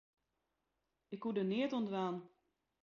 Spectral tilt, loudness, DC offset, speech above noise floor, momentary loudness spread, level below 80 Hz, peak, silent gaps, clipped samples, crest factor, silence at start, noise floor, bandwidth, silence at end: -5.5 dB/octave; -39 LUFS; under 0.1%; 48 dB; 11 LU; -84 dBFS; -26 dBFS; none; under 0.1%; 16 dB; 1.1 s; -87 dBFS; 7 kHz; 0.55 s